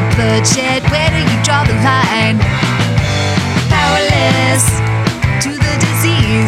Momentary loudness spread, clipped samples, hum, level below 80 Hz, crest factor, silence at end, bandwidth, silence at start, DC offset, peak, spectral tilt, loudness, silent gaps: 3 LU; under 0.1%; none; -28 dBFS; 12 dB; 0 s; 15.5 kHz; 0 s; under 0.1%; 0 dBFS; -4.5 dB/octave; -12 LUFS; none